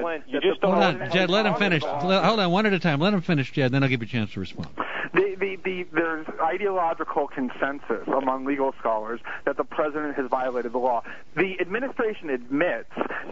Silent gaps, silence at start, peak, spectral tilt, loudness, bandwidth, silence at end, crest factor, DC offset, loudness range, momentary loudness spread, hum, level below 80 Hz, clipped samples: none; 0 s; -8 dBFS; -6.5 dB/octave; -25 LUFS; 7.8 kHz; 0 s; 18 dB; 1%; 5 LU; 9 LU; none; -60 dBFS; under 0.1%